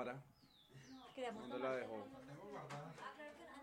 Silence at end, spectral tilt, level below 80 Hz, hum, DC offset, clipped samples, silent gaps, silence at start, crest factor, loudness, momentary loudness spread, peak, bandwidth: 0 s; -5.5 dB/octave; -82 dBFS; none; under 0.1%; under 0.1%; none; 0 s; 20 dB; -50 LUFS; 18 LU; -30 dBFS; 16.5 kHz